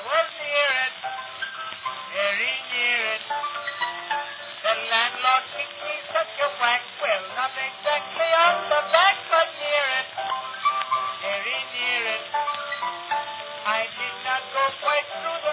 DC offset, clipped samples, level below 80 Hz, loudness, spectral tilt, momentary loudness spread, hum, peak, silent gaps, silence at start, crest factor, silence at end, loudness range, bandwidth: under 0.1%; under 0.1%; -76 dBFS; -24 LUFS; -4.5 dB/octave; 10 LU; none; -2 dBFS; none; 0 s; 22 dB; 0 s; 4 LU; 4 kHz